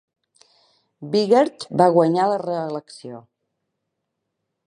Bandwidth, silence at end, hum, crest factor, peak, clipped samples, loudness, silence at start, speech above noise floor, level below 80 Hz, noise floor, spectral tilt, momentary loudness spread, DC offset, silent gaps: 11 kHz; 1.45 s; none; 20 dB; -2 dBFS; under 0.1%; -19 LUFS; 1 s; 59 dB; -70 dBFS; -78 dBFS; -6.5 dB/octave; 22 LU; under 0.1%; none